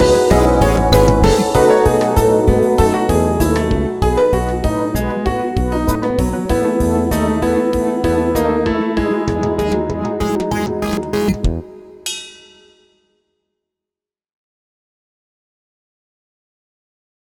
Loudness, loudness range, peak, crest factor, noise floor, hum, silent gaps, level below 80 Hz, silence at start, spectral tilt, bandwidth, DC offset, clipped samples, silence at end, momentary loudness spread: -16 LUFS; 11 LU; 0 dBFS; 16 dB; -88 dBFS; none; none; -26 dBFS; 0 s; -6 dB/octave; 18.5 kHz; under 0.1%; under 0.1%; 4.9 s; 8 LU